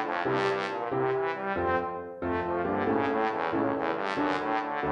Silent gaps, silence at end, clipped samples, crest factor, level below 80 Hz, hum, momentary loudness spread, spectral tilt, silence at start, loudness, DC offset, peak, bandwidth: none; 0 s; under 0.1%; 16 dB; -58 dBFS; none; 3 LU; -6.5 dB/octave; 0 s; -29 LUFS; under 0.1%; -14 dBFS; 9.6 kHz